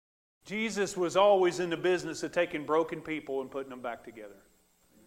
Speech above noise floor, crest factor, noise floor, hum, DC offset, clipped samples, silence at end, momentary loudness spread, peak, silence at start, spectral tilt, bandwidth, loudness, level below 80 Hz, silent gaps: 35 dB; 18 dB; -66 dBFS; none; under 0.1%; under 0.1%; 0.75 s; 16 LU; -12 dBFS; 0.45 s; -4.5 dB/octave; 15.5 kHz; -30 LUFS; -68 dBFS; none